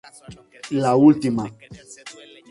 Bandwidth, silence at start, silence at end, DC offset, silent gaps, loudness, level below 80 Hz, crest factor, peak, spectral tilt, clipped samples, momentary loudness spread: 11.5 kHz; 0.3 s; 0.4 s; under 0.1%; none; -18 LUFS; -58 dBFS; 18 dB; -4 dBFS; -7 dB/octave; under 0.1%; 25 LU